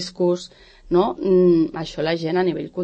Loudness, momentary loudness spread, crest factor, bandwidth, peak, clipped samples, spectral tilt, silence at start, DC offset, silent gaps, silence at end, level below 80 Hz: -20 LUFS; 9 LU; 14 dB; 8.6 kHz; -6 dBFS; under 0.1%; -7 dB/octave; 0 s; under 0.1%; none; 0 s; -48 dBFS